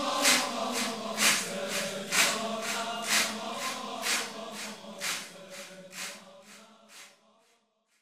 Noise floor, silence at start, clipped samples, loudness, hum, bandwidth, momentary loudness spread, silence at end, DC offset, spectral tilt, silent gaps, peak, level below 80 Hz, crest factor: -71 dBFS; 0 s; under 0.1%; -29 LUFS; none; 16 kHz; 19 LU; 0.95 s; under 0.1%; -0.5 dB/octave; none; -10 dBFS; -82 dBFS; 24 dB